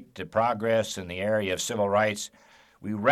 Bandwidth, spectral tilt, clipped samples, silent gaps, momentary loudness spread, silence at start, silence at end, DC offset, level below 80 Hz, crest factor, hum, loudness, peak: 15 kHz; -4 dB/octave; under 0.1%; none; 11 LU; 0 s; 0 s; under 0.1%; -64 dBFS; 18 dB; none; -27 LUFS; -8 dBFS